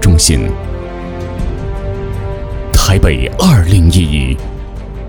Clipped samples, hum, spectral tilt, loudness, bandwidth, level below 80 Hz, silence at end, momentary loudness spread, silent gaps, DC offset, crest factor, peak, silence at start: 0.2%; none; -5 dB/octave; -13 LUFS; over 20 kHz; -18 dBFS; 0 s; 14 LU; none; under 0.1%; 12 dB; 0 dBFS; 0 s